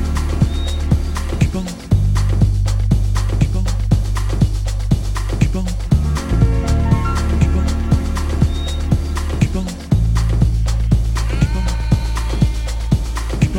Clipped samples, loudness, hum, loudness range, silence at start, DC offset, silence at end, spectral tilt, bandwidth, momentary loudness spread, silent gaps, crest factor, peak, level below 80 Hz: under 0.1%; -18 LUFS; none; 1 LU; 0 s; under 0.1%; 0 s; -6.5 dB/octave; 13 kHz; 4 LU; none; 14 dB; 0 dBFS; -18 dBFS